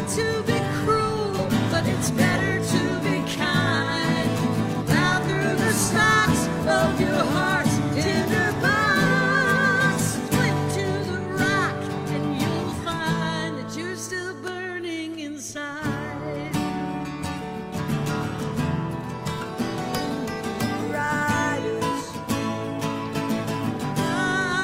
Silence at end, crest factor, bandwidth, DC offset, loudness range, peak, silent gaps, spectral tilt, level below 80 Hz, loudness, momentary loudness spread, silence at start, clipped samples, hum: 0 s; 18 dB; 16.5 kHz; under 0.1%; 8 LU; -6 dBFS; none; -5 dB/octave; -48 dBFS; -24 LUFS; 11 LU; 0 s; under 0.1%; none